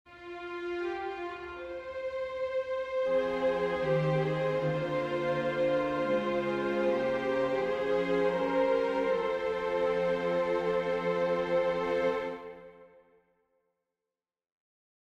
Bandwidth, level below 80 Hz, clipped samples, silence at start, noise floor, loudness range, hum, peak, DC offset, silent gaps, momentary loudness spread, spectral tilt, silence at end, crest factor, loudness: 8.2 kHz; -60 dBFS; under 0.1%; 0.1 s; under -90 dBFS; 5 LU; none; -16 dBFS; under 0.1%; none; 10 LU; -7 dB/octave; 2.2 s; 14 dB; -31 LUFS